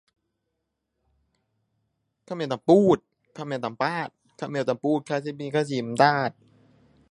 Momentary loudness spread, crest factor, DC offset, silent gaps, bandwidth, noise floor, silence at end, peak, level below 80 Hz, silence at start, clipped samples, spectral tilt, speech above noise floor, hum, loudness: 14 LU; 24 dB; under 0.1%; none; 11.5 kHz; -80 dBFS; 0.8 s; -4 dBFS; -68 dBFS; 2.3 s; under 0.1%; -6.5 dB/octave; 56 dB; none; -25 LUFS